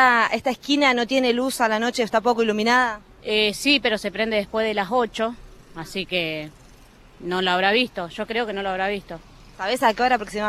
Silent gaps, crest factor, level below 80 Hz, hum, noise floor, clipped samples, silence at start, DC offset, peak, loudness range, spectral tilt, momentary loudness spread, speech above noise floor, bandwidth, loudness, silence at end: none; 18 dB; -52 dBFS; none; -49 dBFS; under 0.1%; 0 s; under 0.1%; -4 dBFS; 5 LU; -3.5 dB/octave; 13 LU; 27 dB; 15 kHz; -22 LUFS; 0 s